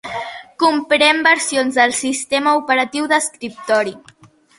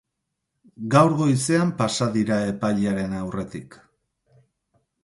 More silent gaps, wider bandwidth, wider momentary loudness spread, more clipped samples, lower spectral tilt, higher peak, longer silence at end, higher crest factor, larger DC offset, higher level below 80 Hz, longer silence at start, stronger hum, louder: neither; about the same, 12 kHz vs 11.5 kHz; about the same, 13 LU vs 14 LU; neither; second, -1.5 dB/octave vs -6 dB/octave; first, 0 dBFS vs -4 dBFS; second, 0.6 s vs 1.3 s; about the same, 16 dB vs 20 dB; neither; second, -62 dBFS vs -54 dBFS; second, 0.05 s vs 0.8 s; neither; first, -16 LUFS vs -22 LUFS